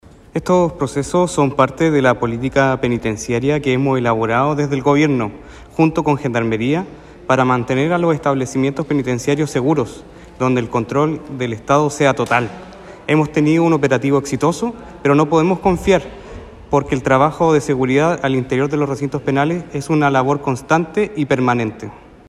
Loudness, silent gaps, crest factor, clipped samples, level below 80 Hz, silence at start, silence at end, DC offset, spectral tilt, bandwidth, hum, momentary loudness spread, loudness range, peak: -17 LUFS; none; 16 dB; under 0.1%; -42 dBFS; 0.35 s; 0.3 s; under 0.1%; -6.5 dB/octave; 13 kHz; none; 9 LU; 2 LU; 0 dBFS